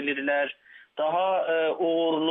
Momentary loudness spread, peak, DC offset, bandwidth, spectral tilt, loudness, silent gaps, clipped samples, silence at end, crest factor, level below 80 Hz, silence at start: 9 LU; -14 dBFS; under 0.1%; 3.9 kHz; -8 dB/octave; -26 LUFS; none; under 0.1%; 0 s; 12 dB; -88 dBFS; 0 s